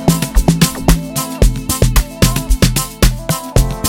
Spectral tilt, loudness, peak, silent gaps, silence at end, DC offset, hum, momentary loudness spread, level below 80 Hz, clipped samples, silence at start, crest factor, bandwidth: -4.5 dB/octave; -15 LUFS; 0 dBFS; none; 0 s; 0.4%; none; 4 LU; -16 dBFS; under 0.1%; 0 s; 12 dB; 18.5 kHz